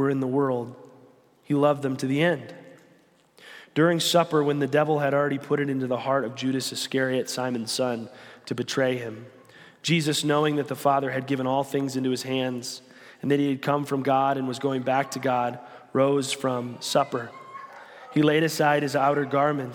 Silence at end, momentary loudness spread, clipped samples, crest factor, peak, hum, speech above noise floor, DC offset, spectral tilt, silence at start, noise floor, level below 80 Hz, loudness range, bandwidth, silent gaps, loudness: 0 s; 12 LU; under 0.1%; 18 dB; -6 dBFS; none; 35 dB; under 0.1%; -5 dB/octave; 0 s; -59 dBFS; -74 dBFS; 3 LU; 17.5 kHz; none; -25 LUFS